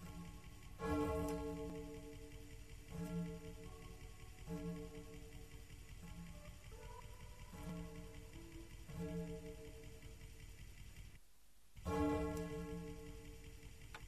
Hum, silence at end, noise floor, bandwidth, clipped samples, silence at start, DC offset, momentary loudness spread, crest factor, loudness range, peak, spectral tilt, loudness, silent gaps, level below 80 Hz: none; 0 s; -71 dBFS; 14.5 kHz; under 0.1%; 0 s; under 0.1%; 17 LU; 22 dB; 8 LU; -26 dBFS; -6.5 dB/octave; -49 LUFS; none; -56 dBFS